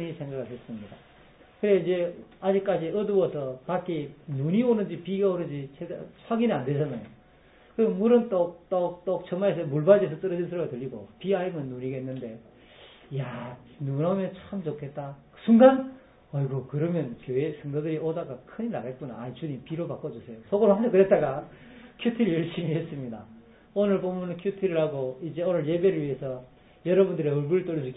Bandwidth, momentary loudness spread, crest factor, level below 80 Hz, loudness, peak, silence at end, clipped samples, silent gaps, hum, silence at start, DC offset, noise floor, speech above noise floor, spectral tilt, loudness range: 4 kHz; 16 LU; 22 dB; -64 dBFS; -27 LUFS; -4 dBFS; 0 s; under 0.1%; none; none; 0 s; under 0.1%; -56 dBFS; 30 dB; -12 dB/octave; 8 LU